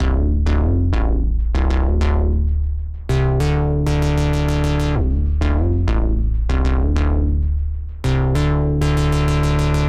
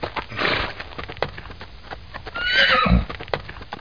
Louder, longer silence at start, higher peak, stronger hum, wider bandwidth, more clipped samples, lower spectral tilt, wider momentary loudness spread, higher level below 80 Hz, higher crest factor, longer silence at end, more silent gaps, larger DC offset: about the same, -19 LUFS vs -21 LUFS; about the same, 0 s vs 0 s; second, -6 dBFS vs -2 dBFS; neither; first, 11 kHz vs 5.2 kHz; neither; first, -7.5 dB/octave vs -5.5 dB/octave; second, 3 LU vs 22 LU; first, -18 dBFS vs -32 dBFS; second, 10 dB vs 22 dB; about the same, 0 s vs 0 s; neither; second, under 0.1% vs 0.7%